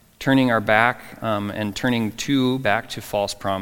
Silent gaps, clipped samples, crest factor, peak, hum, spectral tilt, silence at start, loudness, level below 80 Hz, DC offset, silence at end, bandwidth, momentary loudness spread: none; under 0.1%; 22 dB; 0 dBFS; none; -5 dB/octave; 0.2 s; -21 LUFS; -50 dBFS; under 0.1%; 0 s; 17.5 kHz; 8 LU